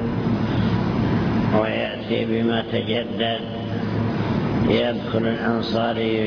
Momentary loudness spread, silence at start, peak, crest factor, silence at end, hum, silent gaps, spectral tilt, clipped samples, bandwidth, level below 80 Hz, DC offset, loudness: 4 LU; 0 s; -6 dBFS; 16 dB; 0 s; none; none; -8 dB/octave; under 0.1%; 5.4 kHz; -40 dBFS; under 0.1%; -22 LUFS